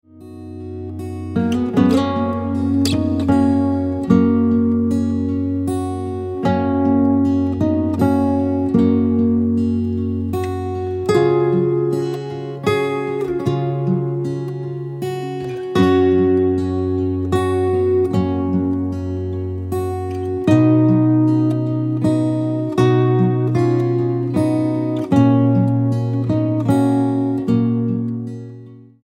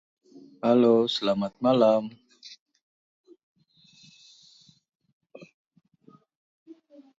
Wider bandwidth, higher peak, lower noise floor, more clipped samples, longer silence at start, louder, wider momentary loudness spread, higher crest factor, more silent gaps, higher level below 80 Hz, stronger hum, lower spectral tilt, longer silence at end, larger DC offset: first, 14 kHz vs 7.8 kHz; first, -2 dBFS vs -8 dBFS; second, -39 dBFS vs -59 dBFS; neither; second, 0.15 s vs 0.65 s; first, -18 LUFS vs -23 LUFS; second, 10 LU vs 27 LU; about the same, 16 dB vs 20 dB; second, none vs 2.59-2.66 s, 2.82-3.24 s, 3.43-3.55 s, 4.95-5.00 s, 5.13-5.20 s; first, -46 dBFS vs -74 dBFS; neither; first, -8.5 dB/octave vs -6.5 dB/octave; second, 0.2 s vs 1.75 s; neither